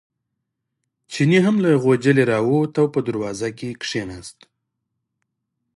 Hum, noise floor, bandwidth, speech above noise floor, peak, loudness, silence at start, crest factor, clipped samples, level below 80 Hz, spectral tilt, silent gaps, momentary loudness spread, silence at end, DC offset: none; -78 dBFS; 11.5 kHz; 60 dB; -2 dBFS; -19 LUFS; 1.1 s; 18 dB; under 0.1%; -58 dBFS; -6.5 dB/octave; none; 15 LU; 1.45 s; under 0.1%